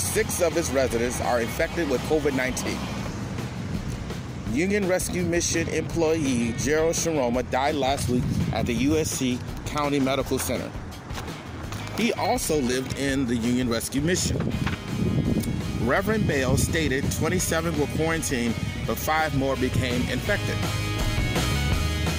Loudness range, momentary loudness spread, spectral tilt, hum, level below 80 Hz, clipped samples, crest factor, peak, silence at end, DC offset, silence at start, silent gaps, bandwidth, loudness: 3 LU; 8 LU; -4.5 dB/octave; none; -38 dBFS; under 0.1%; 16 dB; -10 dBFS; 0 s; under 0.1%; 0 s; none; 16 kHz; -25 LUFS